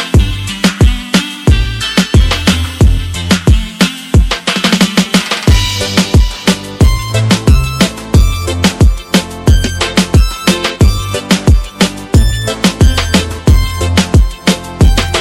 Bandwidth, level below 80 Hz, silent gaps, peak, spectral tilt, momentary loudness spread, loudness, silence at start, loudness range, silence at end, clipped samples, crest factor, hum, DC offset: 17 kHz; -14 dBFS; none; 0 dBFS; -5 dB/octave; 4 LU; -11 LUFS; 0 s; 1 LU; 0 s; under 0.1%; 10 dB; none; under 0.1%